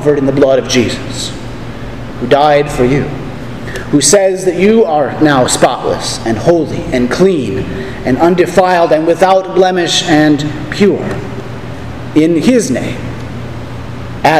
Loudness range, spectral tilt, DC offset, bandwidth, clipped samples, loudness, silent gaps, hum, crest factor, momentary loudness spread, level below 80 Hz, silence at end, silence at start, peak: 4 LU; -4.5 dB/octave; 3%; 15.5 kHz; 0.4%; -11 LUFS; none; none; 12 dB; 15 LU; -34 dBFS; 0 s; 0 s; 0 dBFS